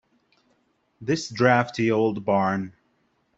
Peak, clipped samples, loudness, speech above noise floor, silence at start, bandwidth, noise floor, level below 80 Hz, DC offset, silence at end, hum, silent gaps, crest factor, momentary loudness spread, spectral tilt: -4 dBFS; under 0.1%; -23 LUFS; 46 dB; 1 s; 8.2 kHz; -68 dBFS; -64 dBFS; under 0.1%; 0.7 s; none; none; 22 dB; 11 LU; -6 dB/octave